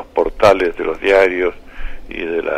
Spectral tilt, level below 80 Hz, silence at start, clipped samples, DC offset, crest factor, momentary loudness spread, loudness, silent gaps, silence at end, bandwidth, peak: -5 dB/octave; -32 dBFS; 0 s; under 0.1%; under 0.1%; 14 dB; 21 LU; -15 LUFS; none; 0 s; 14.5 kHz; -2 dBFS